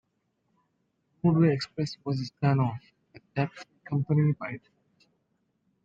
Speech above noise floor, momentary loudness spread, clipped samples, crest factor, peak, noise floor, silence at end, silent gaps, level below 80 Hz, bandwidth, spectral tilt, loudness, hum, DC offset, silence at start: 49 dB; 14 LU; under 0.1%; 18 dB; -12 dBFS; -76 dBFS; 1.25 s; none; -64 dBFS; 7.8 kHz; -8 dB/octave; -28 LUFS; none; under 0.1%; 1.25 s